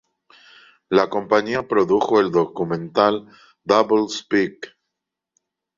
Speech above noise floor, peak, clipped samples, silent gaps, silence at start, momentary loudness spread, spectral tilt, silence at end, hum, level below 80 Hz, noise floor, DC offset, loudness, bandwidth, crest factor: 63 dB; -2 dBFS; under 0.1%; none; 0.9 s; 10 LU; -5.5 dB/octave; 1.1 s; none; -60 dBFS; -83 dBFS; under 0.1%; -20 LUFS; 7.6 kHz; 20 dB